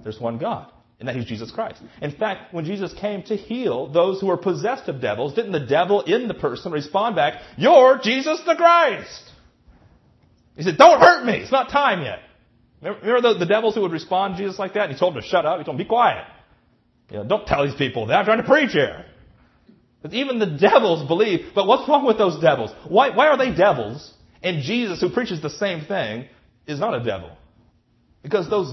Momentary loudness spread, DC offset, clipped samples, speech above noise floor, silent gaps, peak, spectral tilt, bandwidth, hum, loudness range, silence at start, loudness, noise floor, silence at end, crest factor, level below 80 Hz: 15 LU; under 0.1%; under 0.1%; 42 dB; none; 0 dBFS; -5.5 dB/octave; 6.2 kHz; none; 8 LU; 0.05 s; -19 LUFS; -61 dBFS; 0 s; 20 dB; -54 dBFS